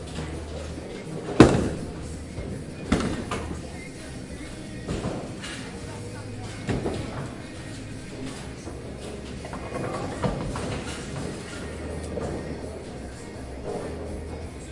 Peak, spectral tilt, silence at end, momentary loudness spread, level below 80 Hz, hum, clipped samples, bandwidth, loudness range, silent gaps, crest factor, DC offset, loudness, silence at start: 0 dBFS; -6 dB/octave; 0 s; 11 LU; -42 dBFS; none; under 0.1%; 11.5 kHz; 9 LU; none; 30 dB; under 0.1%; -30 LUFS; 0 s